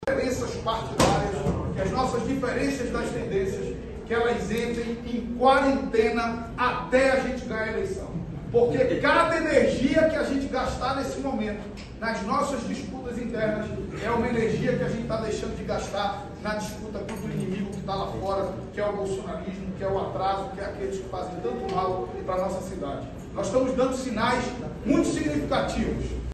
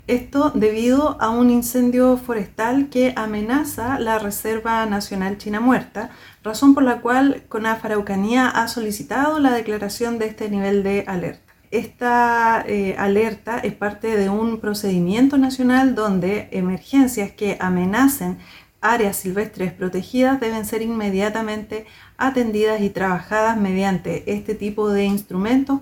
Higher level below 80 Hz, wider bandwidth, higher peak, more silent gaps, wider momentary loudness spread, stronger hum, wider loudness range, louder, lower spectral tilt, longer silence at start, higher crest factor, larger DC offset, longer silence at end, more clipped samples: first, -42 dBFS vs -48 dBFS; second, 12.5 kHz vs 19 kHz; second, -6 dBFS vs -2 dBFS; neither; about the same, 11 LU vs 9 LU; neither; first, 7 LU vs 3 LU; second, -27 LUFS vs -20 LUFS; about the same, -5.5 dB/octave vs -5.5 dB/octave; about the same, 0 s vs 0.05 s; about the same, 20 dB vs 18 dB; neither; about the same, 0 s vs 0 s; neither